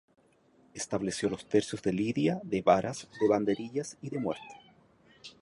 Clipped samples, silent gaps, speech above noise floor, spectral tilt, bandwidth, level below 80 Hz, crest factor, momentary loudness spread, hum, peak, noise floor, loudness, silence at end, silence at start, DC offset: under 0.1%; none; 34 dB; -5.5 dB/octave; 11.5 kHz; -64 dBFS; 22 dB; 14 LU; none; -10 dBFS; -65 dBFS; -31 LUFS; 0.1 s; 0.75 s; under 0.1%